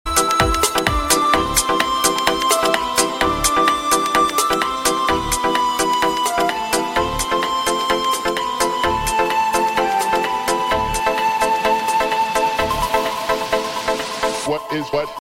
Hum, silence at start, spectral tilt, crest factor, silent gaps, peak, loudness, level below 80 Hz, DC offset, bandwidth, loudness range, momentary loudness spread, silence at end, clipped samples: none; 0.05 s; -2.5 dB/octave; 18 dB; none; 0 dBFS; -18 LUFS; -36 dBFS; under 0.1%; 16.5 kHz; 2 LU; 5 LU; 0.05 s; under 0.1%